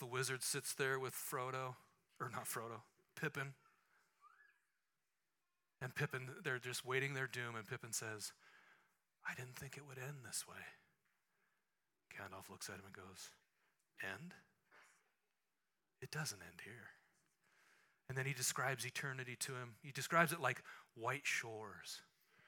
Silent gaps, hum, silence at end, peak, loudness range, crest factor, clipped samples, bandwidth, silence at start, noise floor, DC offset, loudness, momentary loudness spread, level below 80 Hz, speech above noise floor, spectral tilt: none; none; 0.4 s; -18 dBFS; 13 LU; 30 dB; under 0.1%; 18 kHz; 0 s; under -90 dBFS; under 0.1%; -44 LUFS; 16 LU; -88 dBFS; over 45 dB; -3 dB/octave